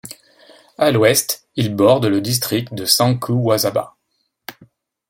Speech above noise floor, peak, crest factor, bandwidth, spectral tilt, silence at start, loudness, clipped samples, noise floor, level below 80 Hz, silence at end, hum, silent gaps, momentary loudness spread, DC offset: 54 dB; 0 dBFS; 18 dB; 17 kHz; -4.5 dB/octave; 0.05 s; -16 LUFS; under 0.1%; -70 dBFS; -58 dBFS; 0.6 s; none; none; 22 LU; under 0.1%